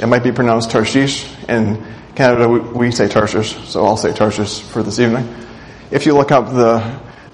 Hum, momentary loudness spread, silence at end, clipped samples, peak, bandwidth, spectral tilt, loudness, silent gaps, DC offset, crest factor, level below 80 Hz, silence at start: none; 11 LU; 0.05 s; under 0.1%; 0 dBFS; 10.5 kHz; -5.5 dB/octave; -15 LUFS; none; under 0.1%; 14 dB; -44 dBFS; 0 s